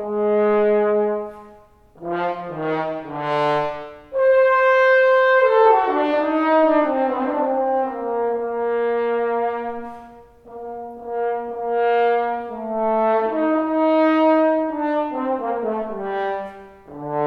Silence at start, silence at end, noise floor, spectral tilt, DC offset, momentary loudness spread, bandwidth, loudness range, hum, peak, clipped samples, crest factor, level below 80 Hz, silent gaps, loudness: 0 s; 0 s; -48 dBFS; -7 dB/octave; under 0.1%; 14 LU; 6.2 kHz; 8 LU; none; -4 dBFS; under 0.1%; 16 dB; -56 dBFS; none; -19 LUFS